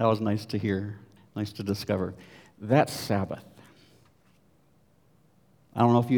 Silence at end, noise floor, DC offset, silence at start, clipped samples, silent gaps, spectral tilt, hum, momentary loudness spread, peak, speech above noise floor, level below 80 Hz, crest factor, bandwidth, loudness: 0 s; -64 dBFS; under 0.1%; 0 s; under 0.1%; none; -7 dB/octave; none; 17 LU; -6 dBFS; 38 dB; -68 dBFS; 24 dB; over 20 kHz; -28 LUFS